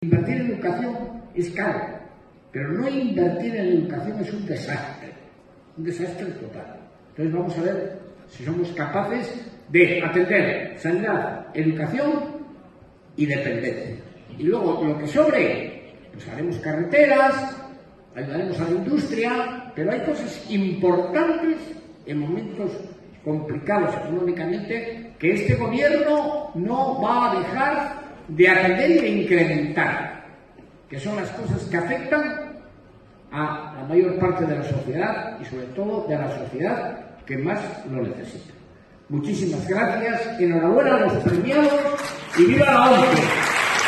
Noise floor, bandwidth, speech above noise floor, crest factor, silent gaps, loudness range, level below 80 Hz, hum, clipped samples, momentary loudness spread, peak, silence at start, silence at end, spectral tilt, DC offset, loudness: -50 dBFS; 12 kHz; 28 dB; 20 dB; none; 8 LU; -54 dBFS; none; under 0.1%; 17 LU; -2 dBFS; 0 s; 0 s; -6 dB/octave; under 0.1%; -22 LUFS